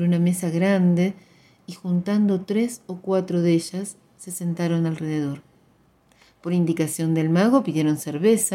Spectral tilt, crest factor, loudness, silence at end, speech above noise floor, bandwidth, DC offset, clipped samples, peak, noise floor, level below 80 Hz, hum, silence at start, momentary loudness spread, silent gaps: -6.5 dB/octave; 18 dB; -22 LUFS; 0 s; 38 dB; 17 kHz; under 0.1%; under 0.1%; -6 dBFS; -59 dBFS; -68 dBFS; none; 0 s; 15 LU; none